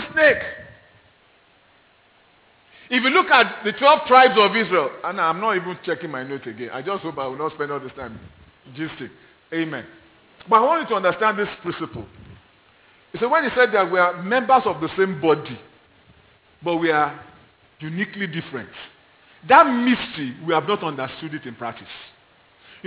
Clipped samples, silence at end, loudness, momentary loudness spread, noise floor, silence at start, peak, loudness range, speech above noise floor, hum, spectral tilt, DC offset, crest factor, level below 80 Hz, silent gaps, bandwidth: under 0.1%; 0.8 s; -20 LUFS; 20 LU; -57 dBFS; 0 s; 0 dBFS; 11 LU; 36 dB; none; -8.5 dB/octave; under 0.1%; 22 dB; -60 dBFS; none; 4 kHz